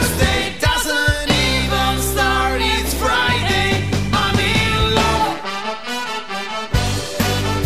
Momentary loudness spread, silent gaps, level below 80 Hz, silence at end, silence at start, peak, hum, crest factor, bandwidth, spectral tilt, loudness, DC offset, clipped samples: 8 LU; none; -28 dBFS; 0 s; 0 s; -2 dBFS; none; 16 dB; 16 kHz; -4 dB/octave; -17 LUFS; 2%; under 0.1%